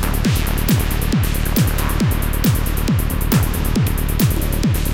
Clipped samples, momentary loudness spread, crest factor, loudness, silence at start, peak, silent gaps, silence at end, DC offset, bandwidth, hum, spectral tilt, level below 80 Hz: under 0.1%; 2 LU; 14 dB; -18 LUFS; 0 s; -4 dBFS; none; 0 s; 0.9%; 17 kHz; none; -5.5 dB/octave; -20 dBFS